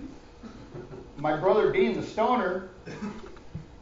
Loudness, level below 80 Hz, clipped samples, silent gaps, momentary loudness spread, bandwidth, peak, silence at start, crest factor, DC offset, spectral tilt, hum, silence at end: -27 LUFS; -52 dBFS; under 0.1%; none; 22 LU; 7.6 kHz; -10 dBFS; 0 s; 18 dB; under 0.1%; -6.5 dB/octave; none; 0 s